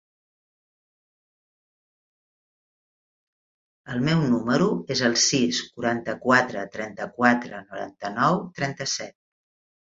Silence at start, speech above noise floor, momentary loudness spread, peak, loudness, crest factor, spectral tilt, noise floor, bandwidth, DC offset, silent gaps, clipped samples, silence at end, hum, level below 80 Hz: 3.85 s; over 66 dB; 13 LU; -4 dBFS; -23 LUFS; 24 dB; -4 dB/octave; under -90 dBFS; 7.8 kHz; under 0.1%; none; under 0.1%; 0.85 s; none; -62 dBFS